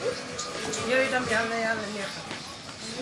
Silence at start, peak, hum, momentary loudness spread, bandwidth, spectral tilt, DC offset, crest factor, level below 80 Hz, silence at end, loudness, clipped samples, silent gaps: 0 s; -12 dBFS; none; 12 LU; 11.5 kHz; -3 dB/octave; under 0.1%; 18 dB; -62 dBFS; 0 s; -29 LUFS; under 0.1%; none